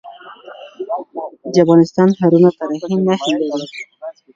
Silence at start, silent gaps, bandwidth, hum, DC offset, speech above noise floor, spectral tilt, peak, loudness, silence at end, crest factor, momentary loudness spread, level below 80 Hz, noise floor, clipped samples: 0.05 s; none; 7.6 kHz; none; under 0.1%; 23 dB; -7 dB/octave; 0 dBFS; -15 LUFS; 0.25 s; 16 dB; 20 LU; -62 dBFS; -37 dBFS; under 0.1%